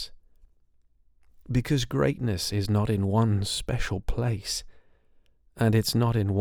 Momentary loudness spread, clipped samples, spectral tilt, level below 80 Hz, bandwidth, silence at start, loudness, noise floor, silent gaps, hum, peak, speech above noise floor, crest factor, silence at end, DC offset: 7 LU; under 0.1%; -5.5 dB/octave; -40 dBFS; 17 kHz; 0 s; -27 LUFS; -62 dBFS; none; none; -10 dBFS; 37 dB; 18 dB; 0 s; under 0.1%